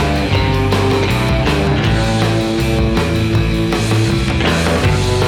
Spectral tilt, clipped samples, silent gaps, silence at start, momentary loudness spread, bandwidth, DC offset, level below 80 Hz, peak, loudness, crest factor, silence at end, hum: -6 dB/octave; under 0.1%; none; 0 s; 1 LU; 17 kHz; under 0.1%; -24 dBFS; -4 dBFS; -15 LUFS; 10 dB; 0 s; none